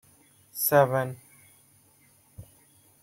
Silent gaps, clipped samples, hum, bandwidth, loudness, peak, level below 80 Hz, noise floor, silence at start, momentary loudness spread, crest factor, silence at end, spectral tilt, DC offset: none; under 0.1%; none; 16.5 kHz; -24 LUFS; -8 dBFS; -66 dBFS; -61 dBFS; 0.55 s; 21 LU; 22 dB; 0.6 s; -4.5 dB/octave; under 0.1%